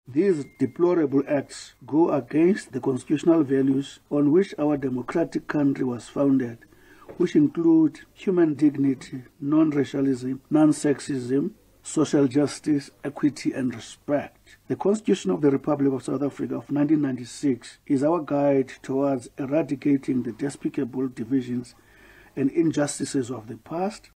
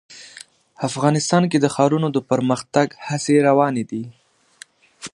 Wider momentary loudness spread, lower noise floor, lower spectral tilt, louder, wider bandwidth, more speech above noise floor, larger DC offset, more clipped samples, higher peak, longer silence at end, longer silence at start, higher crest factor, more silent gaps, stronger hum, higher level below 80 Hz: second, 9 LU vs 21 LU; first, -52 dBFS vs -47 dBFS; about the same, -6.5 dB/octave vs -5.5 dB/octave; second, -24 LUFS vs -19 LUFS; about the same, 11 kHz vs 11.5 kHz; about the same, 28 dB vs 29 dB; neither; neither; second, -8 dBFS vs 0 dBFS; about the same, 0.15 s vs 0.05 s; about the same, 0.1 s vs 0.1 s; about the same, 16 dB vs 20 dB; neither; neither; about the same, -62 dBFS vs -64 dBFS